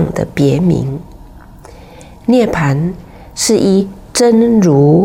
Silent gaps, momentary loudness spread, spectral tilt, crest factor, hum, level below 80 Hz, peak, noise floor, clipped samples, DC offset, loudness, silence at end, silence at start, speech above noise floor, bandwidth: none; 13 LU; -6 dB/octave; 12 dB; none; -38 dBFS; -2 dBFS; -35 dBFS; under 0.1%; under 0.1%; -12 LUFS; 0 s; 0 s; 25 dB; 16.5 kHz